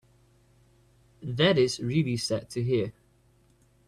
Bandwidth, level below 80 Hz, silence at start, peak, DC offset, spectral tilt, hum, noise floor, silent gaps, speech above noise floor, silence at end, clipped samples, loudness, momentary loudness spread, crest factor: 13.5 kHz; -60 dBFS; 1.2 s; -12 dBFS; under 0.1%; -5.5 dB/octave; none; -63 dBFS; none; 37 dB; 0.95 s; under 0.1%; -27 LUFS; 14 LU; 18 dB